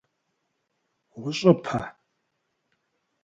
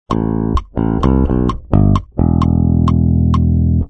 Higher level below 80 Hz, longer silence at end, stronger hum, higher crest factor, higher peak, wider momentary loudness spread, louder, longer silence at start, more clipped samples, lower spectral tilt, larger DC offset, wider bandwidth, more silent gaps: second, -62 dBFS vs -20 dBFS; first, 1.35 s vs 0 s; neither; first, 26 dB vs 12 dB; second, -4 dBFS vs 0 dBFS; first, 16 LU vs 5 LU; second, -24 LUFS vs -14 LUFS; first, 1.15 s vs 0.1 s; neither; second, -6.5 dB/octave vs -10 dB/octave; neither; first, 7.8 kHz vs 6.4 kHz; neither